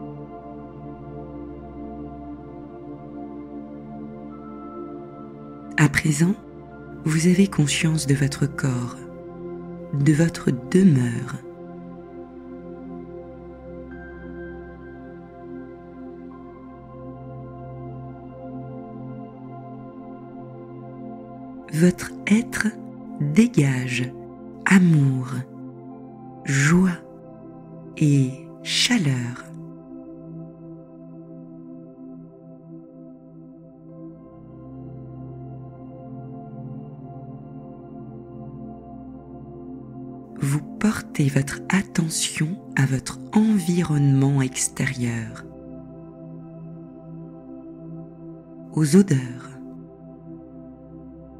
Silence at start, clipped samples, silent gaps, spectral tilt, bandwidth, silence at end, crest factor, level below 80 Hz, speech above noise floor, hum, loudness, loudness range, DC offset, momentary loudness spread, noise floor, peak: 0 s; under 0.1%; none; -5.5 dB/octave; 15 kHz; 0 s; 22 dB; -52 dBFS; 24 dB; none; -22 LUFS; 18 LU; under 0.1%; 22 LU; -44 dBFS; -4 dBFS